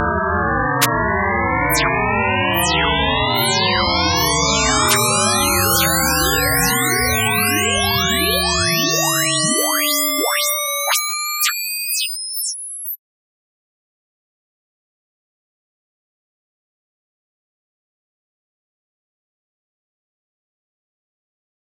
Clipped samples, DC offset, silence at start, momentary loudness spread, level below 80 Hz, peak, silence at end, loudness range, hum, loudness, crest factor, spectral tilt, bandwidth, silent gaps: under 0.1%; under 0.1%; 0 s; 5 LU; -36 dBFS; 0 dBFS; 8.65 s; 10 LU; none; -16 LUFS; 20 dB; -2.5 dB/octave; 16.5 kHz; none